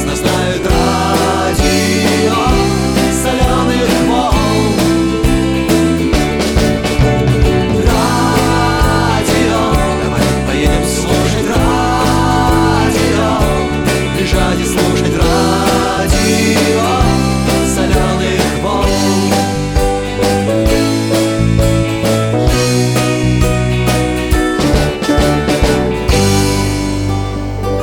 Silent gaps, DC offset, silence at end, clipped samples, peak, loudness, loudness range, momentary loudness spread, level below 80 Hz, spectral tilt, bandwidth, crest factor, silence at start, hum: none; under 0.1%; 0 s; under 0.1%; 0 dBFS; -12 LUFS; 1 LU; 3 LU; -20 dBFS; -5 dB/octave; over 20 kHz; 12 dB; 0 s; none